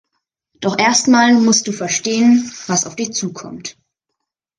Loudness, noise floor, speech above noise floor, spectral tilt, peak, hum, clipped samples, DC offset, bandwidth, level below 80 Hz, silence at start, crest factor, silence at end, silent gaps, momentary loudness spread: -14 LUFS; -78 dBFS; 63 dB; -3 dB/octave; -2 dBFS; none; under 0.1%; under 0.1%; 10.5 kHz; -60 dBFS; 0.6 s; 16 dB; 0.85 s; none; 17 LU